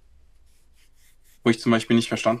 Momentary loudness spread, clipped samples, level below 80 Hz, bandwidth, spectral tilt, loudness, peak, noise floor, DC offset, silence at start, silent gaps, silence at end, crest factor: 4 LU; under 0.1%; -56 dBFS; 12.5 kHz; -5.5 dB/octave; -22 LUFS; -6 dBFS; -54 dBFS; under 0.1%; 1.45 s; none; 0 s; 18 dB